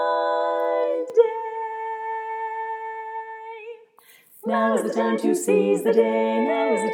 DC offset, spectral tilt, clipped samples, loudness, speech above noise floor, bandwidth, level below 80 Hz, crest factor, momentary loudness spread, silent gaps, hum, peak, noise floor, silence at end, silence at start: under 0.1%; -5 dB/octave; under 0.1%; -23 LUFS; 33 dB; 17 kHz; -90 dBFS; 18 dB; 14 LU; none; none; -4 dBFS; -54 dBFS; 0 s; 0 s